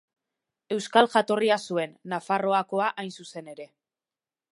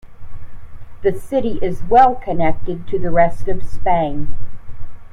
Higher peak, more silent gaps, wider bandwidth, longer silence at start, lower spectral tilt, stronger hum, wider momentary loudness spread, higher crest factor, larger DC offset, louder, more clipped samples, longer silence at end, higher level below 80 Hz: second, -4 dBFS vs 0 dBFS; neither; first, 11.5 kHz vs 4 kHz; first, 0.7 s vs 0.05 s; second, -4.5 dB/octave vs -8 dB/octave; neither; first, 19 LU vs 16 LU; first, 24 dB vs 14 dB; neither; second, -25 LUFS vs -18 LUFS; neither; first, 0.85 s vs 0.05 s; second, -82 dBFS vs -30 dBFS